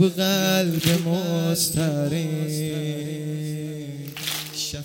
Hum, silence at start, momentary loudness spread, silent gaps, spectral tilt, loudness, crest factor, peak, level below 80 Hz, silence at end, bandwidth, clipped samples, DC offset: none; 0 s; 10 LU; none; -4.5 dB/octave; -24 LUFS; 18 dB; -6 dBFS; -54 dBFS; 0 s; 17 kHz; under 0.1%; under 0.1%